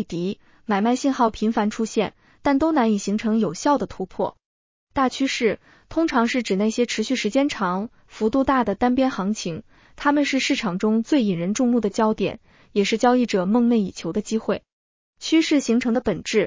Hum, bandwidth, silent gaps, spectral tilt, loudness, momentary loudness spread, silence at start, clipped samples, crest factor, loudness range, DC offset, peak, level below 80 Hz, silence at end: none; 7.6 kHz; 4.46-4.87 s, 14.72-15.13 s; -5 dB/octave; -22 LUFS; 9 LU; 0 s; under 0.1%; 16 dB; 2 LU; under 0.1%; -6 dBFS; -52 dBFS; 0 s